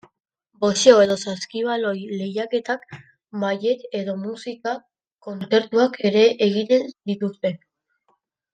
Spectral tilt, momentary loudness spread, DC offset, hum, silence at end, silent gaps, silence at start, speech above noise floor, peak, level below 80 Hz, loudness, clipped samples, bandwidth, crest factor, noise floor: -4.5 dB/octave; 14 LU; under 0.1%; none; 0.95 s; 5.12-5.17 s; 0.6 s; 48 dB; 0 dBFS; -70 dBFS; -21 LUFS; under 0.1%; 9.2 kHz; 22 dB; -68 dBFS